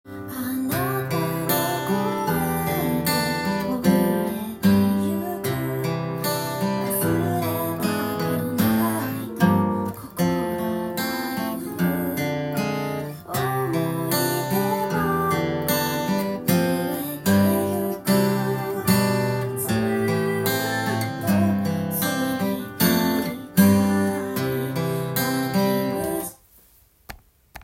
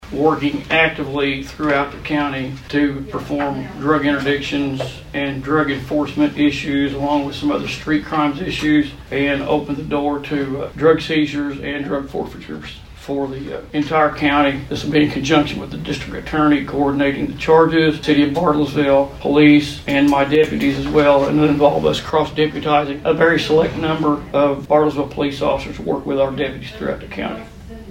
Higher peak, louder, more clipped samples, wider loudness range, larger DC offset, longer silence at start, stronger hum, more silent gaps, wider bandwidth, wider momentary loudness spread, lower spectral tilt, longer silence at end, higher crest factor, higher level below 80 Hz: about the same, -4 dBFS vs -2 dBFS; second, -23 LUFS vs -18 LUFS; neither; second, 3 LU vs 6 LU; neither; about the same, 0.05 s vs 0 s; neither; neither; first, 17 kHz vs 12 kHz; second, 7 LU vs 11 LU; about the same, -5.5 dB/octave vs -6 dB/octave; about the same, 0 s vs 0 s; about the same, 18 dB vs 16 dB; second, -54 dBFS vs -40 dBFS